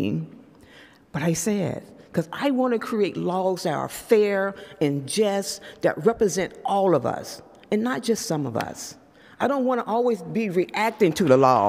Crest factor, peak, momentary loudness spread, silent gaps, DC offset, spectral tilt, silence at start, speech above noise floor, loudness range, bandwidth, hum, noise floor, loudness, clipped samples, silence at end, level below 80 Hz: 20 dB; -4 dBFS; 10 LU; none; under 0.1%; -5 dB/octave; 0 s; 28 dB; 3 LU; 16 kHz; none; -51 dBFS; -24 LUFS; under 0.1%; 0 s; -60 dBFS